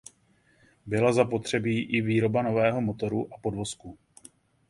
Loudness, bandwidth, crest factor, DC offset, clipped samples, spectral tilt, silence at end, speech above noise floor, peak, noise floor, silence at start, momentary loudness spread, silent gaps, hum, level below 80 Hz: -27 LUFS; 11.5 kHz; 22 dB; under 0.1%; under 0.1%; -6 dB/octave; 0.75 s; 38 dB; -6 dBFS; -65 dBFS; 0.85 s; 10 LU; none; none; -58 dBFS